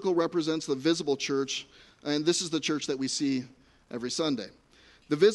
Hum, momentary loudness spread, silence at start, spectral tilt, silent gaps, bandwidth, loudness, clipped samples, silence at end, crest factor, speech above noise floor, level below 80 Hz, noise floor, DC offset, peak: none; 12 LU; 0 s; -4 dB/octave; none; 11.5 kHz; -29 LUFS; under 0.1%; 0 s; 20 dB; 31 dB; -70 dBFS; -59 dBFS; under 0.1%; -10 dBFS